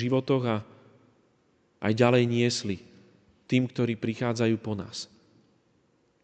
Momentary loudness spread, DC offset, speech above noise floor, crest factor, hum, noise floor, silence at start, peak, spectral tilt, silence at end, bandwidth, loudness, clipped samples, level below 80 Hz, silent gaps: 14 LU; under 0.1%; 41 dB; 20 dB; none; -67 dBFS; 0 s; -8 dBFS; -6 dB/octave; 1.2 s; 9 kHz; -27 LUFS; under 0.1%; -68 dBFS; none